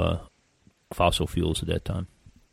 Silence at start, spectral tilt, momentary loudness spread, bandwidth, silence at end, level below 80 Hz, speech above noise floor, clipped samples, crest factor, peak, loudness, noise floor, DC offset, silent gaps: 0 s; -5.5 dB/octave; 14 LU; 16 kHz; 0.2 s; -40 dBFS; 37 dB; under 0.1%; 22 dB; -6 dBFS; -27 LUFS; -63 dBFS; under 0.1%; none